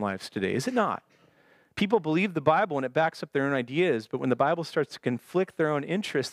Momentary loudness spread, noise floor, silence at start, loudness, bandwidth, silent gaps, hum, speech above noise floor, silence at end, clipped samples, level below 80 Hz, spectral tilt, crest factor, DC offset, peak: 6 LU; -62 dBFS; 0 s; -27 LUFS; 15 kHz; none; none; 35 dB; 0 s; under 0.1%; -70 dBFS; -6 dB/octave; 20 dB; under 0.1%; -8 dBFS